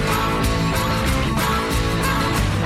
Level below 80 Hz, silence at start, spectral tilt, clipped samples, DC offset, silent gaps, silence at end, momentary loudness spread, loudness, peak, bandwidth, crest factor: -26 dBFS; 0 s; -5 dB/octave; under 0.1%; under 0.1%; none; 0 s; 1 LU; -20 LUFS; -10 dBFS; 16.5 kHz; 10 dB